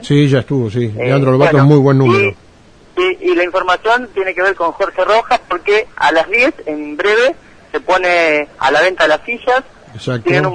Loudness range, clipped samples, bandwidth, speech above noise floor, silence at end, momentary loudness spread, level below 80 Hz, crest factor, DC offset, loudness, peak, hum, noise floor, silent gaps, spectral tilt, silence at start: 2 LU; under 0.1%; 10 kHz; 30 dB; 0 s; 8 LU; -46 dBFS; 14 dB; under 0.1%; -13 LUFS; 0 dBFS; none; -43 dBFS; none; -6.5 dB/octave; 0 s